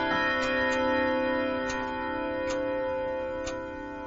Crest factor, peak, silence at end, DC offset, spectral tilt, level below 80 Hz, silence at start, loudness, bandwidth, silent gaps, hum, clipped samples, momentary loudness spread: 14 dB; -14 dBFS; 0 s; under 0.1%; -4.5 dB/octave; -50 dBFS; 0 s; -29 LUFS; 7.8 kHz; none; none; under 0.1%; 8 LU